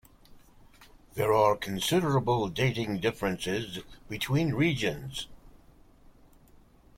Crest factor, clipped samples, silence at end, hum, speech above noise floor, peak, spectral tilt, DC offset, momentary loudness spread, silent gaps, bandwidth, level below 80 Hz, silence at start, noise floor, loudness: 20 dB; under 0.1%; 1.45 s; none; 29 dB; -10 dBFS; -5.5 dB/octave; under 0.1%; 14 LU; none; 16.5 kHz; -54 dBFS; 0.3 s; -57 dBFS; -29 LUFS